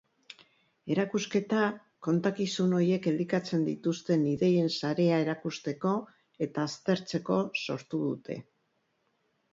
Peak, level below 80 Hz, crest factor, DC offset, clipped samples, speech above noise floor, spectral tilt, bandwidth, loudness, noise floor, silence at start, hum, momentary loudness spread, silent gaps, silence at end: -14 dBFS; -72 dBFS; 16 dB; under 0.1%; under 0.1%; 46 dB; -6.5 dB/octave; 7.8 kHz; -30 LUFS; -75 dBFS; 0.85 s; none; 9 LU; none; 1.1 s